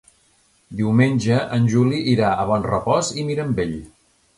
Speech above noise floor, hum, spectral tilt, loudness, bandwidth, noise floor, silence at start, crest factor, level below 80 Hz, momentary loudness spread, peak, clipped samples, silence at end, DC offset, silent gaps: 41 dB; none; -6.5 dB/octave; -20 LUFS; 11.5 kHz; -59 dBFS; 0.7 s; 18 dB; -46 dBFS; 8 LU; -2 dBFS; under 0.1%; 0.5 s; under 0.1%; none